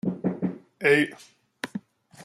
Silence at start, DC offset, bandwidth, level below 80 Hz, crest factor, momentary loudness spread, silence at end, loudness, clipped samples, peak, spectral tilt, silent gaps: 0.05 s; under 0.1%; 14 kHz; -70 dBFS; 20 dB; 16 LU; 0 s; -26 LUFS; under 0.1%; -8 dBFS; -6 dB/octave; none